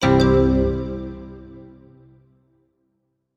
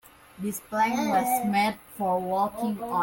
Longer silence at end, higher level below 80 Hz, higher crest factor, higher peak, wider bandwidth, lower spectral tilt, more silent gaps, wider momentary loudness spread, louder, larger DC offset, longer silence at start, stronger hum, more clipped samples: first, 1.7 s vs 0 s; first, -32 dBFS vs -62 dBFS; about the same, 18 dB vs 14 dB; first, -4 dBFS vs -12 dBFS; second, 10.5 kHz vs 17 kHz; first, -7.5 dB/octave vs -4.5 dB/octave; neither; first, 25 LU vs 9 LU; first, -19 LUFS vs -27 LUFS; neither; second, 0 s vs 0.35 s; neither; neither